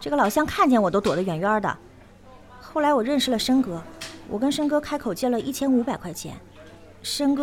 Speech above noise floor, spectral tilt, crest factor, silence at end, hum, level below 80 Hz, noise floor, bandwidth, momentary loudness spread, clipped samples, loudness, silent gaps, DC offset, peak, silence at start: 25 dB; -4.5 dB/octave; 18 dB; 0 s; none; -52 dBFS; -48 dBFS; 17 kHz; 15 LU; under 0.1%; -23 LUFS; none; under 0.1%; -6 dBFS; 0 s